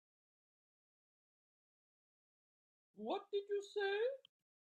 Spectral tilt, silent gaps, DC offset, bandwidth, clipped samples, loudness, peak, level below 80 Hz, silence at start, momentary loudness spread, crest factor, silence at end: -3.5 dB/octave; none; under 0.1%; 8.8 kHz; under 0.1%; -42 LUFS; -30 dBFS; under -90 dBFS; 2.95 s; 10 LU; 18 dB; 0.5 s